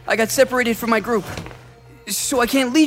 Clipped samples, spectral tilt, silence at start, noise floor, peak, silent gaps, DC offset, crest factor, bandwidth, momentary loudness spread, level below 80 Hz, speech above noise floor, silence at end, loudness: under 0.1%; -3 dB/octave; 0.05 s; -44 dBFS; -2 dBFS; none; under 0.1%; 18 dB; 16 kHz; 16 LU; -48 dBFS; 26 dB; 0 s; -19 LUFS